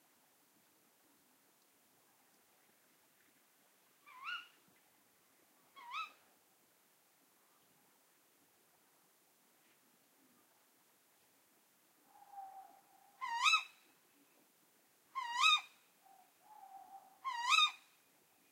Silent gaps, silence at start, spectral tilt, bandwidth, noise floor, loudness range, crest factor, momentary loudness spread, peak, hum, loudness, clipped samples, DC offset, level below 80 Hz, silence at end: none; 4.1 s; 3.5 dB/octave; 16 kHz; -73 dBFS; 19 LU; 28 dB; 28 LU; -16 dBFS; none; -35 LUFS; under 0.1%; under 0.1%; under -90 dBFS; 0.75 s